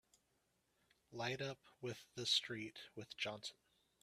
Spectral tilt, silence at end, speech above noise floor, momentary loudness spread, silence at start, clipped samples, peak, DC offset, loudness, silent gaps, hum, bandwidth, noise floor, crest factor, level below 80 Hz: -3 dB/octave; 0.5 s; 37 dB; 16 LU; 1.1 s; under 0.1%; -26 dBFS; under 0.1%; -44 LUFS; none; none; 14.5 kHz; -82 dBFS; 22 dB; -84 dBFS